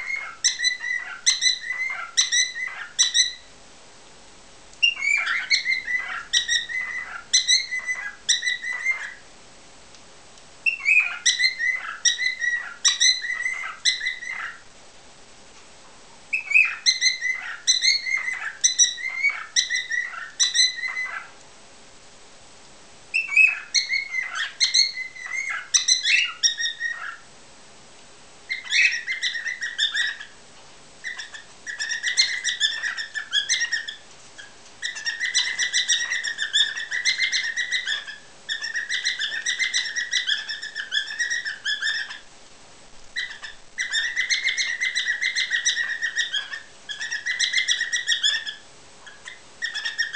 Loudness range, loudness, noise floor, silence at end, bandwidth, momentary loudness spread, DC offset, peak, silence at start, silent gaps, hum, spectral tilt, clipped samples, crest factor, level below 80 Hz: 5 LU; -22 LUFS; -48 dBFS; 0 s; 8 kHz; 14 LU; 0.3%; -4 dBFS; 0 s; none; none; 4 dB/octave; under 0.1%; 22 dB; -66 dBFS